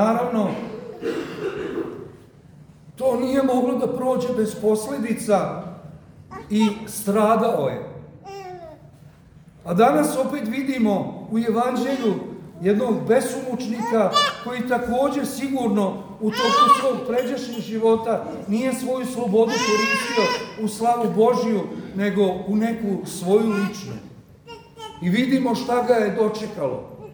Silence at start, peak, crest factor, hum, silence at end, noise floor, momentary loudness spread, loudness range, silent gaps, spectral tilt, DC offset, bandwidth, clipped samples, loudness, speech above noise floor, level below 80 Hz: 0 s; -2 dBFS; 20 dB; none; 0 s; -48 dBFS; 15 LU; 3 LU; none; -5 dB/octave; under 0.1%; over 20 kHz; under 0.1%; -22 LUFS; 27 dB; -58 dBFS